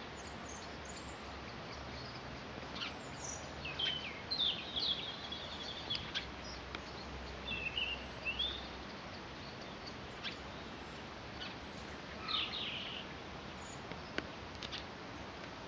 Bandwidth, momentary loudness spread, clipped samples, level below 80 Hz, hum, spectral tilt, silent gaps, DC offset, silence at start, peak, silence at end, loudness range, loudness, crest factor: 10 kHz; 11 LU; under 0.1%; -58 dBFS; none; -3 dB/octave; none; under 0.1%; 0 s; -20 dBFS; 0 s; 7 LU; -42 LUFS; 24 dB